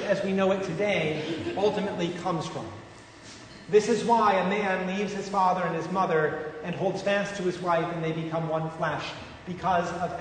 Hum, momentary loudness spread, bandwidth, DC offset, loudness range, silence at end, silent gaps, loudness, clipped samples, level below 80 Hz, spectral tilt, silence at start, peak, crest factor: none; 15 LU; 9.6 kHz; under 0.1%; 4 LU; 0 s; none; -27 LUFS; under 0.1%; -60 dBFS; -5.5 dB/octave; 0 s; -10 dBFS; 18 dB